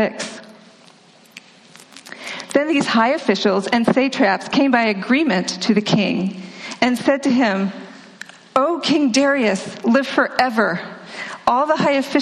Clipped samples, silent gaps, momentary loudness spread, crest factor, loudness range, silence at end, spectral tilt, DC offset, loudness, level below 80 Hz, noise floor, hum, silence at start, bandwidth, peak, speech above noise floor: under 0.1%; none; 15 LU; 18 dB; 3 LU; 0 s; -4.5 dB/octave; under 0.1%; -18 LUFS; -62 dBFS; -48 dBFS; none; 0 s; 13 kHz; -2 dBFS; 31 dB